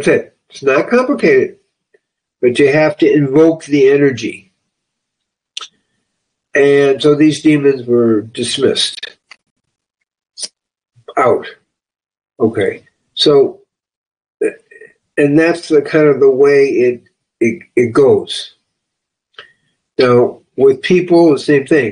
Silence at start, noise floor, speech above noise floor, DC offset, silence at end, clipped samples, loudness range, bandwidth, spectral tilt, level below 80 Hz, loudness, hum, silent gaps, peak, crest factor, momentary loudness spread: 0 s; -77 dBFS; 66 dB; under 0.1%; 0 s; under 0.1%; 6 LU; 10 kHz; -5.5 dB/octave; -58 dBFS; -12 LUFS; none; 9.51-9.56 s, 13.97-14.11 s; 0 dBFS; 14 dB; 17 LU